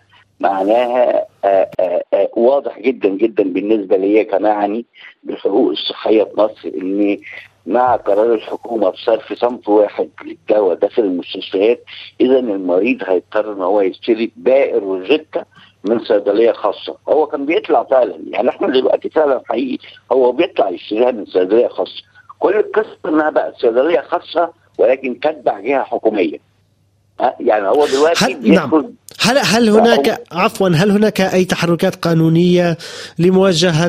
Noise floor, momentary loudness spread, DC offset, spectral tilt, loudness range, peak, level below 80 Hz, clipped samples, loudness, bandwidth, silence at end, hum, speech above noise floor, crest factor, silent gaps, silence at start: -57 dBFS; 8 LU; under 0.1%; -5.5 dB/octave; 4 LU; 0 dBFS; -56 dBFS; under 0.1%; -15 LUFS; 14.5 kHz; 0 s; none; 43 dB; 14 dB; none; 0.4 s